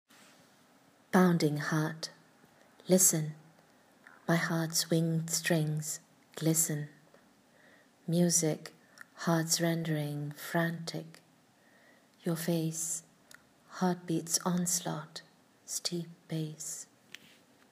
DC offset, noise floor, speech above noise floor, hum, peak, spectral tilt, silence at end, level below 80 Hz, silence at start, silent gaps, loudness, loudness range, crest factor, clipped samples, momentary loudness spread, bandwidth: under 0.1%; -65 dBFS; 33 dB; none; -10 dBFS; -4 dB/octave; 0.85 s; -84 dBFS; 1.15 s; none; -31 LUFS; 6 LU; 22 dB; under 0.1%; 18 LU; 15.5 kHz